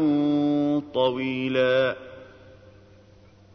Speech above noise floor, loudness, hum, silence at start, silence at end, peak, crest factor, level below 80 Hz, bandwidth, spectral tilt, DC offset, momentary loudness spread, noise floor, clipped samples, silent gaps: 29 dB; -23 LUFS; none; 0 s; 1.3 s; -10 dBFS; 14 dB; -62 dBFS; 6.2 kHz; -7.5 dB/octave; under 0.1%; 6 LU; -53 dBFS; under 0.1%; none